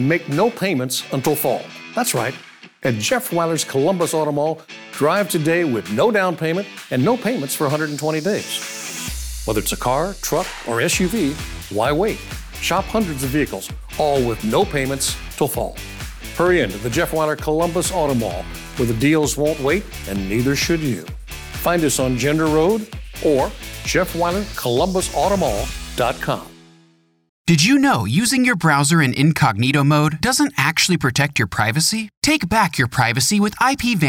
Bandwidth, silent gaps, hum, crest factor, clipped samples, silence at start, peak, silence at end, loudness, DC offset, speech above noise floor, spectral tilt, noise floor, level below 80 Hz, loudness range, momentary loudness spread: over 20 kHz; 27.29-27.45 s, 32.17-32.22 s; none; 16 dB; under 0.1%; 0 s; -4 dBFS; 0 s; -19 LUFS; under 0.1%; 37 dB; -4.5 dB/octave; -56 dBFS; -38 dBFS; 5 LU; 10 LU